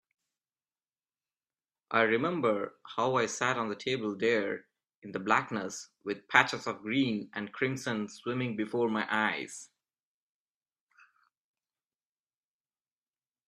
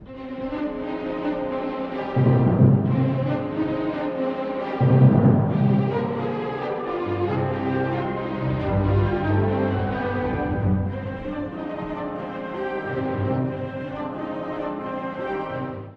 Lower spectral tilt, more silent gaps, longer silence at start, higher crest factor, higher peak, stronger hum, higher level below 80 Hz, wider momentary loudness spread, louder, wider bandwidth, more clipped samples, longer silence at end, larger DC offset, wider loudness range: second, -4.5 dB/octave vs -10.5 dB/octave; first, 4.95-5.02 s vs none; first, 1.9 s vs 0 s; first, 28 dB vs 18 dB; about the same, -4 dBFS vs -4 dBFS; neither; second, -76 dBFS vs -44 dBFS; about the same, 13 LU vs 12 LU; second, -31 LUFS vs -24 LUFS; first, 13.5 kHz vs 5 kHz; neither; first, 3.85 s vs 0 s; neither; about the same, 5 LU vs 7 LU